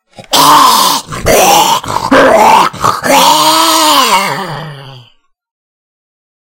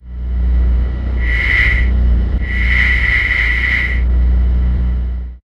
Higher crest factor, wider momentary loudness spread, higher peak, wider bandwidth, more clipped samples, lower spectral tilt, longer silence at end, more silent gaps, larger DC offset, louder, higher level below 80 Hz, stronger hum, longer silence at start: about the same, 8 dB vs 12 dB; about the same, 9 LU vs 7 LU; about the same, 0 dBFS vs 0 dBFS; first, over 20 kHz vs 5.6 kHz; first, 2% vs under 0.1%; second, -2 dB/octave vs -6.5 dB/octave; first, 1.5 s vs 0.05 s; neither; neither; first, -6 LUFS vs -15 LUFS; second, -36 dBFS vs -14 dBFS; neither; first, 0.2 s vs 0.05 s